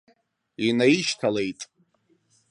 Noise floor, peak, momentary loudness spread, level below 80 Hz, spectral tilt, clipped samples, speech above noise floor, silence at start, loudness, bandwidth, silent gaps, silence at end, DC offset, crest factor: -67 dBFS; -6 dBFS; 18 LU; -68 dBFS; -4.5 dB/octave; under 0.1%; 44 dB; 0.6 s; -23 LUFS; 11 kHz; none; 0.85 s; under 0.1%; 20 dB